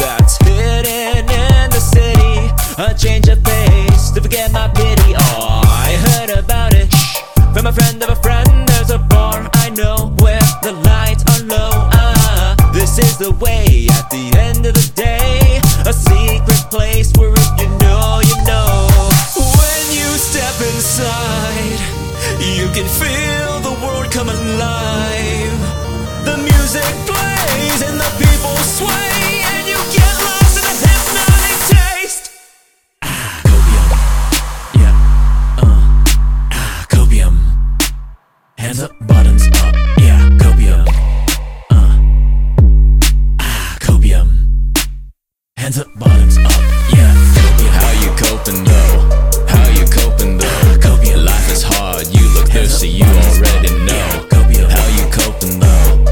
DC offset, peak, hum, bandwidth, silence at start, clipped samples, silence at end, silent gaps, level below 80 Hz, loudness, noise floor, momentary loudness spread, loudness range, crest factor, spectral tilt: under 0.1%; 0 dBFS; none; 18.5 kHz; 0 s; 0.2%; 0 s; none; -12 dBFS; -12 LUFS; -53 dBFS; 7 LU; 4 LU; 10 dB; -4.5 dB/octave